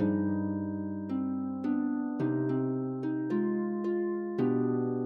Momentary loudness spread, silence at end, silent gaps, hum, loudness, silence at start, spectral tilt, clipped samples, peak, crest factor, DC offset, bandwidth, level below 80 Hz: 5 LU; 0 s; none; none; -32 LUFS; 0 s; -11 dB/octave; under 0.1%; -18 dBFS; 12 dB; under 0.1%; 4.8 kHz; -76 dBFS